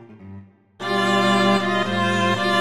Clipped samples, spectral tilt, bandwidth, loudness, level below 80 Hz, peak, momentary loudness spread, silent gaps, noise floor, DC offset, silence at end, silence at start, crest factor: under 0.1%; -5 dB/octave; 13.5 kHz; -19 LUFS; -64 dBFS; -6 dBFS; 6 LU; none; -43 dBFS; under 0.1%; 0 s; 0 s; 14 dB